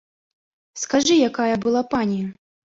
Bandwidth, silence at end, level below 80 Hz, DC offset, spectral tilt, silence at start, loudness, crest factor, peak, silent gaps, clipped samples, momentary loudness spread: 8 kHz; 0.45 s; -56 dBFS; under 0.1%; -4 dB/octave; 0.75 s; -20 LUFS; 16 dB; -6 dBFS; none; under 0.1%; 14 LU